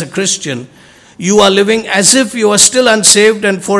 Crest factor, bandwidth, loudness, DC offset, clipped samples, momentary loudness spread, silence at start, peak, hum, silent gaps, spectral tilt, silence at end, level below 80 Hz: 10 dB; 12 kHz; -8 LUFS; under 0.1%; 2%; 11 LU; 0 s; 0 dBFS; none; none; -2 dB/octave; 0 s; -50 dBFS